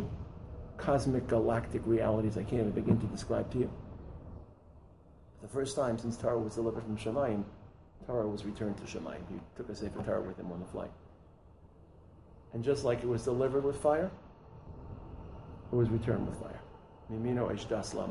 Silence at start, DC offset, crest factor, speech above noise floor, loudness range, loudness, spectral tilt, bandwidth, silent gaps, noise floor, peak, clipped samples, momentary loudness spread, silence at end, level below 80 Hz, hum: 0 s; under 0.1%; 20 dB; 25 dB; 7 LU; -34 LUFS; -7 dB/octave; 11.5 kHz; none; -58 dBFS; -14 dBFS; under 0.1%; 18 LU; 0 s; -52 dBFS; none